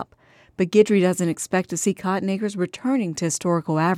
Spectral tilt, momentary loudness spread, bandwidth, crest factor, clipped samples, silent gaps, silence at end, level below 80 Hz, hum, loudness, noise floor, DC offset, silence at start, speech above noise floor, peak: -5.5 dB/octave; 8 LU; 15 kHz; 18 dB; under 0.1%; none; 0 s; -64 dBFS; none; -22 LUFS; -55 dBFS; under 0.1%; 0 s; 34 dB; -4 dBFS